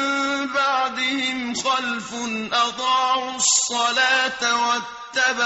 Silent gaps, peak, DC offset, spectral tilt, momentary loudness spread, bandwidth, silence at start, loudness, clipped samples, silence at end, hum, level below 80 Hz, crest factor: none; -6 dBFS; under 0.1%; 0 dB/octave; 8 LU; 8.2 kHz; 0 s; -20 LUFS; under 0.1%; 0 s; none; -62 dBFS; 16 dB